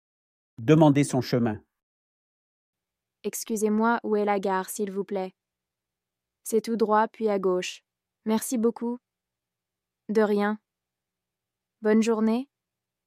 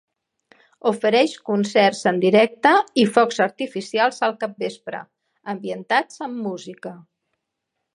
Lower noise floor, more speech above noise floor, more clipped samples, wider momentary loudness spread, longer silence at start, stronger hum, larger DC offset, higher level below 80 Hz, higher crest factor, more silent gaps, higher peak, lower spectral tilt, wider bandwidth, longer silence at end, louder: first, -88 dBFS vs -79 dBFS; first, 63 dB vs 59 dB; neither; about the same, 15 LU vs 17 LU; second, 0.6 s vs 0.85 s; neither; neither; about the same, -72 dBFS vs -74 dBFS; about the same, 22 dB vs 20 dB; first, 1.83-2.73 s vs none; second, -6 dBFS vs -2 dBFS; first, -6 dB/octave vs -4.5 dB/octave; first, 15.5 kHz vs 11.5 kHz; second, 0.65 s vs 0.95 s; second, -25 LUFS vs -20 LUFS